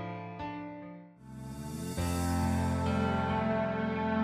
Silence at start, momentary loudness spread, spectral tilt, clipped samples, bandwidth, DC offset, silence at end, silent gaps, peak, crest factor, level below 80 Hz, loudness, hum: 0 s; 16 LU; -6.5 dB/octave; under 0.1%; 15.5 kHz; under 0.1%; 0 s; none; -18 dBFS; 14 dB; -48 dBFS; -33 LUFS; none